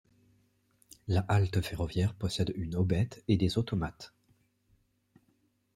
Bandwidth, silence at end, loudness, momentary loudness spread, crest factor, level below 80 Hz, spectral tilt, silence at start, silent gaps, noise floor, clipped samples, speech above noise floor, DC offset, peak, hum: 14 kHz; 1.7 s; -31 LUFS; 10 LU; 20 dB; -52 dBFS; -7 dB/octave; 1.05 s; none; -73 dBFS; under 0.1%; 43 dB; under 0.1%; -14 dBFS; none